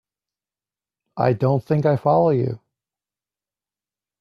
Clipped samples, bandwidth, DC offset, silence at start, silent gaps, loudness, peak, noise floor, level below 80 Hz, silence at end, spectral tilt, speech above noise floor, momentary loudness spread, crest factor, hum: under 0.1%; 6.4 kHz; under 0.1%; 1.15 s; none; -20 LUFS; -4 dBFS; under -90 dBFS; -60 dBFS; 1.65 s; -10 dB/octave; over 72 dB; 13 LU; 20 dB; 50 Hz at -55 dBFS